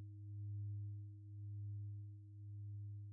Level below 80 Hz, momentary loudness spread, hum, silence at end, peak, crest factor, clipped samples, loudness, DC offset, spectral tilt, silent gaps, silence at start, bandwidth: -82 dBFS; 7 LU; none; 0 s; -42 dBFS; 8 dB; under 0.1%; -51 LUFS; under 0.1%; -20.5 dB/octave; none; 0 s; 0.4 kHz